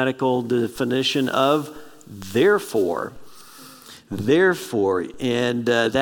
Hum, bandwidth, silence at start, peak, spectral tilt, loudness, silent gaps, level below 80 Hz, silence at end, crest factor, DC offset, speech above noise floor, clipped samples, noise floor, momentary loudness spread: none; 18 kHz; 0 s; -4 dBFS; -5 dB/octave; -21 LUFS; none; -58 dBFS; 0 s; 18 dB; under 0.1%; 23 dB; under 0.1%; -44 dBFS; 18 LU